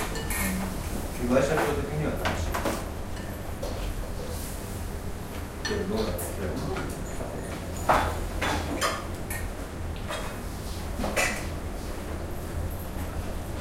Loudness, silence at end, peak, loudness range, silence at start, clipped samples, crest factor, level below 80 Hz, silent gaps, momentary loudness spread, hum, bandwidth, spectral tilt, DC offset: -31 LUFS; 0 s; -8 dBFS; 4 LU; 0 s; under 0.1%; 22 dB; -36 dBFS; none; 11 LU; none; 16 kHz; -4.5 dB/octave; under 0.1%